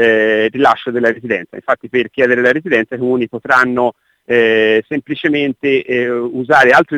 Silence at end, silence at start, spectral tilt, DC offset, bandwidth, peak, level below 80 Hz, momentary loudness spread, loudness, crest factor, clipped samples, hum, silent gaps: 0 s; 0 s; -5.5 dB/octave; under 0.1%; 11.5 kHz; 0 dBFS; -56 dBFS; 8 LU; -14 LUFS; 14 dB; under 0.1%; none; none